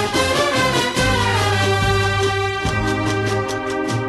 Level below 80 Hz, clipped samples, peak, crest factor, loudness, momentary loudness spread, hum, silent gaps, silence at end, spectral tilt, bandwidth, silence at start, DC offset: -34 dBFS; under 0.1%; -4 dBFS; 14 dB; -18 LUFS; 5 LU; none; none; 0 s; -4.5 dB/octave; 12.5 kHz; 0 s; under 0.1%